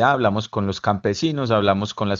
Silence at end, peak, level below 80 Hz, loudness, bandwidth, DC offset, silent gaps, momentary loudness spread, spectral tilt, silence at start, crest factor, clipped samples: 0 s; -2 dBFS; -54 dBFS; -21 LUFS; 7.6 kHz; under 0.1%; none; 5 LU; -6 dB/octave; 0 s; 18 dB; under 0.1%